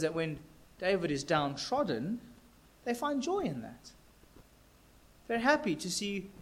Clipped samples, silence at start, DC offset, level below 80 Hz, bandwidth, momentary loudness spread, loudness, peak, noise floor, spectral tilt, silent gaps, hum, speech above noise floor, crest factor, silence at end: under 0.1%; 0 s; under 0.1%; -62 dBFS; 16.5 kHz; 13 LU; -33 LUFS; -14 dBFS; -61 dBFS; -4.5 dB/octave; none; none; 28 dB; 22 dB; 0 s